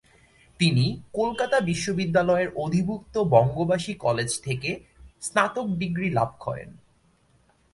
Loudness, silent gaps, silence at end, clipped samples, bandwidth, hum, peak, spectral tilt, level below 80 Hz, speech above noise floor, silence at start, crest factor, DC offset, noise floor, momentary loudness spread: -25 LUFS; none; 0.95 s; under 0.1%; 11.5 kHz; none; -4 dBFS; -5.5 dB/octave; -54 dBFS; 38 dB; 0.6 s; 20 dB; under 0.1%; -63 dBFS; 8 LU